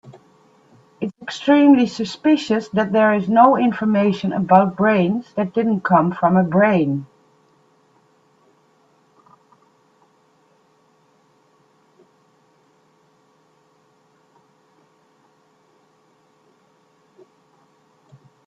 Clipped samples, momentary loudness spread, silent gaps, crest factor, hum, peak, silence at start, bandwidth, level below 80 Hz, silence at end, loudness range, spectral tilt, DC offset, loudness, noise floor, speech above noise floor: under 0.1%; 10 LU; none; 20 dB; none; 0 dBFS; 0.05 s; 7.8 kHz; -66 dBFS; 11.4 s; 6 LU; -7.5 dB/octave; under 0.1%; -17 LUFS; -59 dBFS; 43 dB